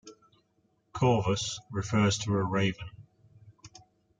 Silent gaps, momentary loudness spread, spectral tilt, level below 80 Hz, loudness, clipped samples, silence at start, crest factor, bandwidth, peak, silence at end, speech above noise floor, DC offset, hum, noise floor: none; 15 LU; -5 dB/octave; -60 dBFS; -29 LUFS; under 0.1%; 0.05 s; 20 dB; 9.4 kHz; -12 dBFS; 0.4 s; 44 dB; under 0.1%; none; -72 dBFS